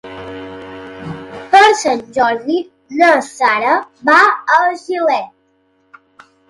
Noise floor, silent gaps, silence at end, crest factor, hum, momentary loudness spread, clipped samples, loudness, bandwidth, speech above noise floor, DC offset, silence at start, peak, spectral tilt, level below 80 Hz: -58 dBFS; none; 1.25 s; 16 dB; none; 20 LU; under 0.1%; -13 LUFS; 11.5 kHz; 45 dB; under 0.1%; 0.05 s; 0 dBFS; -3 dB/octave; -56 dBFS